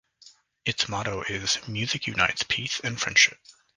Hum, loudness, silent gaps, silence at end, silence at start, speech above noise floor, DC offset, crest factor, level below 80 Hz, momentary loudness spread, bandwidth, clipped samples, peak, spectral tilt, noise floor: none; -25 LUFS; none; 0.25 s; 0.25 s; 29 dB; under 0.1%; 24 dB; -56 dBFS; 10 LU; 11 kHz; under 0.1%; -4 dBFS; -1.5 dB/octave; -56 dBFS